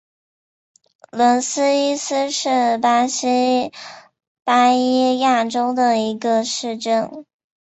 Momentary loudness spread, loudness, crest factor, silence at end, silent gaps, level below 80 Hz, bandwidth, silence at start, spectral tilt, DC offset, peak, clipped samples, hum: 8 LU; -18 LUFS; 16 dB; 0.45 s; 4.27-4.35 s; -68 dBFS; 8.2 kHz; 1.15 s; -2.5 dB/octave; under 0.1%; -2 dBFS; under 0.1%; none